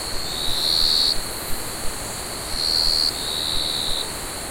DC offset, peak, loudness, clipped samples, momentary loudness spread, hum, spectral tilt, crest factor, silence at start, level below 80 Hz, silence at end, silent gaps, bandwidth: under 0.1%; -8 dBFS; -21 LUFS; under 0.1%; 12 LU; none; -1 dB/octave; 16 dB; 0 s; -36 dBFS; 0 s; none; 16.5 kHz